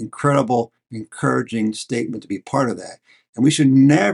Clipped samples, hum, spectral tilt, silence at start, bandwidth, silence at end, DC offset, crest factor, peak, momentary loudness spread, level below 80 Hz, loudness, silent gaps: under 0.1%; none; -6 dB/octave; 0 s; 11.5 kHz; 0 s; under 0.1%; 16 dB; -2 dBFS; 19 LU; -62 dBFS; -19 LUFS; 3.29-3.33 s